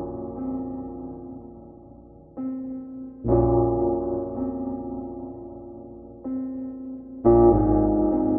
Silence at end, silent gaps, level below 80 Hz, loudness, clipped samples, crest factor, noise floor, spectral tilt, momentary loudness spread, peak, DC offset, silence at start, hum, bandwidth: 0 s; none; -38 dBFS; -24 LUFS; under 0.1%; 18 dB; -47 dBFS; -15.5 dB/octave; 21 LU; -6 dBFS; under 0.1%; 0 s; none; 2.1 kHz